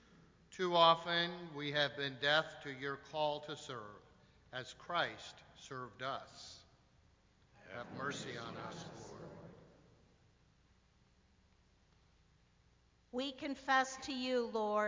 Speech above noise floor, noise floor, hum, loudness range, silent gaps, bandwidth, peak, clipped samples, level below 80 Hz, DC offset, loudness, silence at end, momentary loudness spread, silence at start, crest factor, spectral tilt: 33 dB; -71 dBFS; none; 17 LU; none; 7.6 kHz; -16 dBFS; under 0.1%; -72 dBFS; under 0.1%; -38 LUFS; 0 s; 20 LU; 0.2 s; 26 dB; -3.5 dB/octave